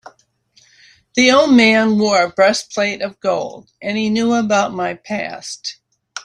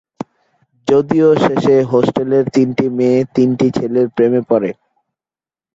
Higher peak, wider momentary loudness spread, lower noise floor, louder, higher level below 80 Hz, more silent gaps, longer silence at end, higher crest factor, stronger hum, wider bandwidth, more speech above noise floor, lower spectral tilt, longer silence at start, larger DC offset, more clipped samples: about the same, -2 dBFS vs -2 dBFS; first, 16 LU vs 9 LU; second, -56 dBFS vs under -90 dBFS; about the same, -15 LUFS vs -14 LUFS; about the same, -58 dBFS vs -54 dBFS; neither; second, 0.05 s vs 1 s; about the same, 16 dB vs 14 dB; neither; first, 11 kHz vs 7.8 kHz; second, 40 dB vs over 77 dB; second, -4 dB/octave vs -7.5 dB/octave; first, 1.15 s vs 0.85 s; neither; neither